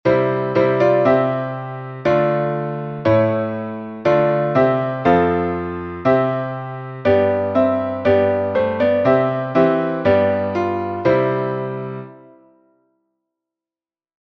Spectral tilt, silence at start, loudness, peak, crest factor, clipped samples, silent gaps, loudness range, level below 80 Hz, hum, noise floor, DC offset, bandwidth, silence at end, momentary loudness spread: -9 dB/octave; 0.05 s; -18 LUFS; -2 dBFS; 16 dB; under 0.1%; none; 5 LU; -52 dBFS; none; under -90 dBFS; under 0.1%; 6.2 kHz; 2.15 s; 11 LU